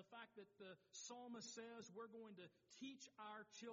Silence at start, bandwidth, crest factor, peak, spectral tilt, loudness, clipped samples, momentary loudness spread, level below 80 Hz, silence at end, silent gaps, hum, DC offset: 0 s; 7.4 kHz; 16 dB; -44 dBFS; -2.5 dB/octave; -58 LUFS; under 0.1%; 7 LU; under -90 dBFS; 0 s; none; none; under 0.1%